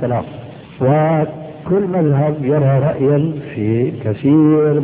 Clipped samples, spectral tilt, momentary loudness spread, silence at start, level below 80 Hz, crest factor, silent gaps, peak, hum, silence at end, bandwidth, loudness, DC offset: under 0.1%; -13.5 dB/octave; 11 LU; 0 s; -50 dBFS; 14 dB; none; -2 dBFS; none; 0 s; 3.8 kHz; -15 LUFS; under 0.1%